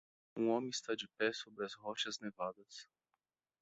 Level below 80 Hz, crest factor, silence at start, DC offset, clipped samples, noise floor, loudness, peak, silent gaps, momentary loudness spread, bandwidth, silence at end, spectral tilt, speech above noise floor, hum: -86 dBFS; 22 dB; 0.35 s; under 0.1%; under 0.1%; -89 dBFS; -40 LUFS; -20 dBFS; none; 16 LU; 8.2 kHz; 0.8 s; -3 dB/octave; 47 dB; none